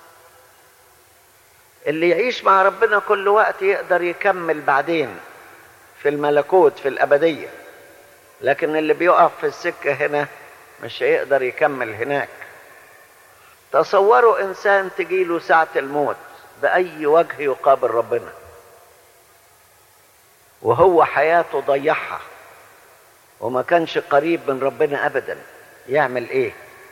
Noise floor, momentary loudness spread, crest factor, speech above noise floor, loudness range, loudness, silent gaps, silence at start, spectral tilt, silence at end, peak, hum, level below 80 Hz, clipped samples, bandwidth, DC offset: -52 dBFS; 12 LU; 18 dB; 35 dB; 4 LU; -18 LUFS; none; 1.85 s; -5.5 dB/octave; 0.25 s; -2 dBFS; none; -64 dBFS; under 0.1%; 17 kHz; under 0.1%